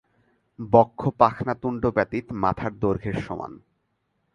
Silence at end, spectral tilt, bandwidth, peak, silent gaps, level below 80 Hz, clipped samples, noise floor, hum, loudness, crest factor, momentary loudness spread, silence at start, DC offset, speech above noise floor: 0.75 s; -9 dB/octave; 9.4 kHz; -2 dBFS; none; -50 dBFS; under 0.1%; -73 dBFS; none; -24 LUFS; 24 dB; 14 LU; 0.6 s; under 0.1%; 50 dB